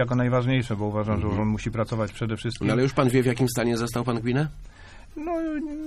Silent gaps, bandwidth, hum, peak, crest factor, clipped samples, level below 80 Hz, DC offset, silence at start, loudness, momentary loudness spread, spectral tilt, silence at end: none; 14 kHz; none; -8 dBFS; 16 dB; under 0.1%; -44 dBFS; under 0.1%; 0 s; -25 LUFS; 8 LU; -6.5 dB/octave; 0 s